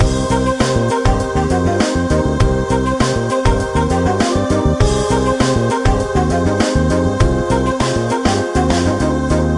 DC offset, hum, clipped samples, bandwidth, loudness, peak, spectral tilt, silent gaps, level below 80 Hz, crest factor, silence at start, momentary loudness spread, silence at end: under 0.1%; none; under 0.1%; 11.5 kHz; -15 LUFS; 0 dBFS; -6 dB/octave; none; -24 dBFS; 14 dB; 0 s; 2 LU; 0 s